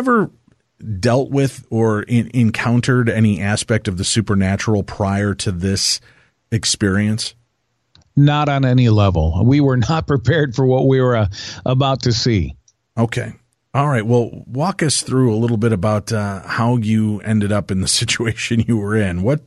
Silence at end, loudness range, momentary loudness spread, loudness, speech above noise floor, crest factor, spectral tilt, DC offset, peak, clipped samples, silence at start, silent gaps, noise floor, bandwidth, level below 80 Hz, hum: 0.1 s; 4 LU; 8 LU; -17 LUFS; 52 dB; 14 dB; -5.5 dB/octave; under 0.1%; -4 dBFS; under 0.1%; 0 s; none; -68 dBFS; 12.5 kHz; -38 dBFS; none